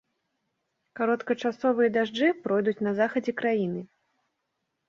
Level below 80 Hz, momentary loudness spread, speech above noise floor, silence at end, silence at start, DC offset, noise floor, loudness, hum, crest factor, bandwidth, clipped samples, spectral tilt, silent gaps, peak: -74 dBFS; 5 LU; 54 dB; 1.05 s; 0.95 s; under 0.1%; -80 dBFS; -26 LUFS; none; 18 dB; 7.2 kHz; under 0.1%; -6.5 dB/octave; none; -10 dBFS